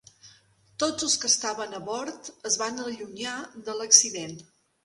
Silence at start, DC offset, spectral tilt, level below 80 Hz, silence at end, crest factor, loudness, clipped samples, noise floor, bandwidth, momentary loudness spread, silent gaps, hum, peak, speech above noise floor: 0.25 s; under 0.1%; 0 dB/octave; -70 dBFS; 0.4 s; 28 dB; -24 LUFS; under 0.1%; -59 dBFS; 11.5 kHz; 19 LU; none; none; -2 dBFS; 32 dB